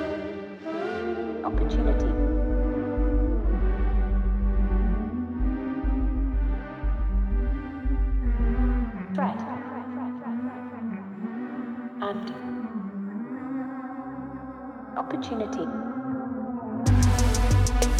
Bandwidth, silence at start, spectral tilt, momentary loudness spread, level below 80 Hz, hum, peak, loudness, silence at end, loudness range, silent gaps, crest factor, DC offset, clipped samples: 12.5 kHz; 0 s; -6.5 dB/octave; 11 LU; -28 dBFS; none; -12 dBFS; -28 LUFS; 0 s; 7 LU; none; 14 dB; under 0.1%; under 0.1%